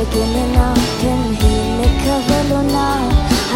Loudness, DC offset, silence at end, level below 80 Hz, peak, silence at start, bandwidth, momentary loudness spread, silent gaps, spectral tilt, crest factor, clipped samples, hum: -15 LUFS; under 0.1%; 0 s; -20 dBFS; -2 dBFS; 0 s; 17 kHz; 2 LU; none; -5.5 dB/octave; 12 dB; under 0.1%; none